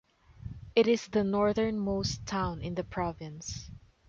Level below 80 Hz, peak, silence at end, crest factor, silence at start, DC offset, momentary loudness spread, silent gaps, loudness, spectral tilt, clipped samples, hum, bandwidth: -50 dBFS; -12 dBFS; 0.3 s; 18 dB; 0.3 s; under 0.1%; 18 LU; none; -31 LUFS; -5.5 dB/octave; under 0.1%; none; 7.6 kHz